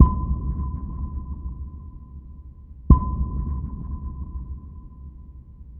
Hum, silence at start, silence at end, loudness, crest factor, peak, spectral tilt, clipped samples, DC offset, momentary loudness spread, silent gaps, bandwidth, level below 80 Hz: none; 0 s; 0 s; -26 LUFS; 24 dB; 0 dBFS; -13.5 dB/octave; under 0.1%; under 0.1%; 25 LU; none; 1.3 kHz; -26 dBFS